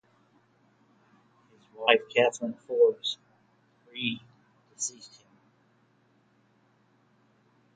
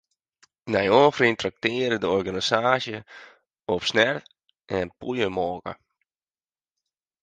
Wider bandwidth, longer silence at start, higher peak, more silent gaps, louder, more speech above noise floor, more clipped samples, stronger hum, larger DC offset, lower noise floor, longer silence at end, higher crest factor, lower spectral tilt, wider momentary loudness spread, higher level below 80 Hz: about the same, 9.4 kHz vs 9.4 kHz; first, 1.8 s vs 0.65 s; about the same, -4 dBFS vs -4 dBFS; neither; second, -28 LUFS vs -23 LUFS; second, 39 dB vs over 67 dB; neither; neither; neither; second, -66 dBFS vs under -90 dBFS; first, 2.7 s vs 1.5 s; first, 28 dB vs 22 dB; second, -2 dB/octave vs -4.5 dB/octave; about the same, 19 LU vs 17 LU; second, -82 dBFS vs -58 dBFS